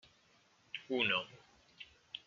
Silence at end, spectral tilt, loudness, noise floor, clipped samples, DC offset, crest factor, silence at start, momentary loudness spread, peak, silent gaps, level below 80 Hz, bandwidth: 0.1 s; -0.5 dB/octave; -37 LUFS; -70 dBFS; under 0.1%; under 0.1%; 24 dB; 0.75 s; 22 LU; -18 dBFS; none; -80 dBFS; 7.4 kHz